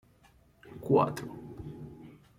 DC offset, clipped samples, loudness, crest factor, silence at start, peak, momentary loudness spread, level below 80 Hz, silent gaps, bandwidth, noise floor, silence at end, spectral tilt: under 0.1%; under 0.1%; -29 LUFS; 22 dB; 0.65 s; -12 dBFS; 23 LU; -62 dBFS; none; 16.5 kHz; -63 dBFS; 0.25 s; -7.5 dB/octave